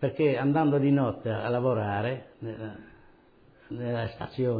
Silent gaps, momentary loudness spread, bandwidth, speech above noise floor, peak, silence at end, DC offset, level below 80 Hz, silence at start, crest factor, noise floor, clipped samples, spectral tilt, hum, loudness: none; 16 LU; 5 kHz; 31 dB; -14 dBFS; 0 s; under 0.1%; -60 dBFS; 0 s; 14 dB; -58 dBFS; under 0.1%; -11 dB/octave; none; -28 LUFS